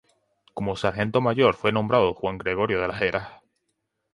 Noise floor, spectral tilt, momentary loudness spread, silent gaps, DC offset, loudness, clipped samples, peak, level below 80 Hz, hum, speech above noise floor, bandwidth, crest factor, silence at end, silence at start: -77 dBFS; -7 dB/octave; 11 LU; none; under 0.1%; -24 LUFS; under 0.1%; -4 dBFS; -52 dBFS; none; 54 dB; 11 kHz; 20 dB; 0.8 s; 0.55 s